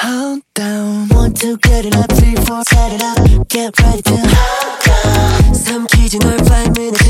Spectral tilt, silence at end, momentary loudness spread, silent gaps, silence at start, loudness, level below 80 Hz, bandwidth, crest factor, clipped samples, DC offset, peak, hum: -5 dB/octave; 0 s; 6 LU; none; 0 s; -12 LUFS; -14 dBFS; 16.5 kHz; 10 dB; under 0.1%; under 0.1%; 0 dBFS; none